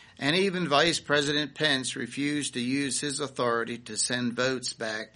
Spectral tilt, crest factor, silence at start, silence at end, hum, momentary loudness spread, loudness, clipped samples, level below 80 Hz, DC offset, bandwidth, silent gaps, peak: -3 dB/octave; 22 dB; 0.2 s; 0.1 s; none; 8 LU; -27 LUFS; under 0.1%; -66 dBFS; under 0.1%; 10.5 kHz; none; -6 dBFS